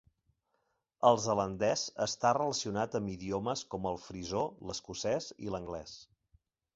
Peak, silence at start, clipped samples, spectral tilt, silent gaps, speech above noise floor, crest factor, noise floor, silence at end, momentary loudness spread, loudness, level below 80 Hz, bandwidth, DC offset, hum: -12 dBFS; 1 s; under 0.1%; -4 dB/octave; none; 47 dB; 24 dB; -80 dBFS; 0.7 s; 12 LU; -34 LUFS; -62 dBFS; 8 kHz; under 0.1%; none